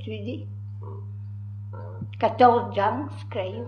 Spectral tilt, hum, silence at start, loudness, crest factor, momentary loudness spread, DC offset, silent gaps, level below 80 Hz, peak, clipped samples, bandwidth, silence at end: -8.5 dB/octave; none; 0 s; -24 LUFS; 20 dB; 19 LU; under 0.1%; none; -64 dBFS; -6 dBFS; under 0.1%; 8.8 kHz; 0 s